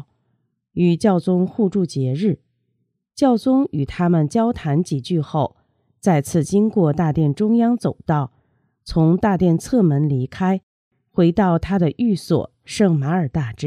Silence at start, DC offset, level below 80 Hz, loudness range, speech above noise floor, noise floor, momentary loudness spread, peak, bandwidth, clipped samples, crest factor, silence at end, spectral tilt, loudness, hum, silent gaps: 0.75 s; under 0.1%; -46 dBFS; 1 LU; 53 dB; -71 dBFS; 7 LU; -2 dBFS; 13.5 kHz; under 0.1%; 16 dB; 0 s; -7.5 dB/octave; -19 LUFS; none; 10.63-10.91 s